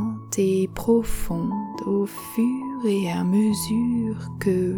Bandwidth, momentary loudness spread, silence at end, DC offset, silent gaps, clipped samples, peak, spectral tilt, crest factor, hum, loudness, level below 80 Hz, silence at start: 19.5 kHz; 7 LU; 0 s; under 0.1%; none; under 0.1%; -8 dBFS; -6.5 dB/octave; 14 dB; none; -24 LUFS; -40 dBFS; 0 s